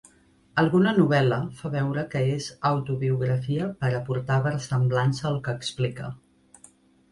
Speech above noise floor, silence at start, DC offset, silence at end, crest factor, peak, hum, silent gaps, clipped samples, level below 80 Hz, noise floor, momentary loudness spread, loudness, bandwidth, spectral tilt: 35 dB; 0.55 s; under 0.1%; 0.95 s; 18 dB; -6 dBFS; none; none; under 0.1%; -58 dBFS; -59 dBFS; 9 LU; -25 LUFS; 11.5 kHz; -7 dB/octave